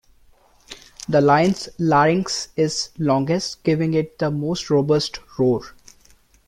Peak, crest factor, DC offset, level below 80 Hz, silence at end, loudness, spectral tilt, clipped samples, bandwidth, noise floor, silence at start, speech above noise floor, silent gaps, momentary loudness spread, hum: -4 dBFS; 18 dB; under 0.1%; -52 dBFS; 0.75 s; -20 LUFS; -5.5 dB/octave; under 0.1%; 13.5 kHz; -54 dBFS; 0.7 s; 34 dB; none; 10 LU; none